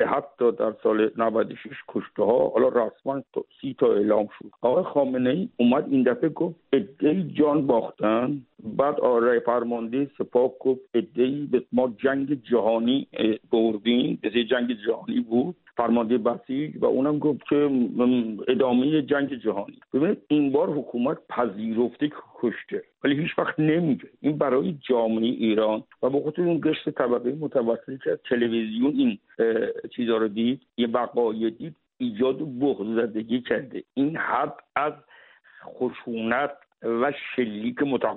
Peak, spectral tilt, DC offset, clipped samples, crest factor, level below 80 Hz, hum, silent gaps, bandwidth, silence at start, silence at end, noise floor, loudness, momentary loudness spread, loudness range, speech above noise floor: -8 dBFS; -5 dB/octave; under 0.1%; under 0.1%; 16 dB; -66 dBFS; none; none; 4.1 kHz; 0 s; 0 s; -53 dBFS; -25 LUFS; 8 LU; 3 LU; 29 dB